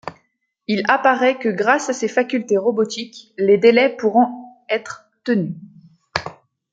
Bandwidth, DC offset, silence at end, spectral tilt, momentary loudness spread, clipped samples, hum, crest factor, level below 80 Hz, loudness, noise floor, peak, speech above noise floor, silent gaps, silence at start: 9.2 kHz; under 0.1%; 0.4 s; -5 dB/octave; 20 LU; under 0.1%; none; 18 dB; -62 dBFS; -18 LUFS; -67 dBFS; -2 dBFS; 50 dB; none; 0.05 s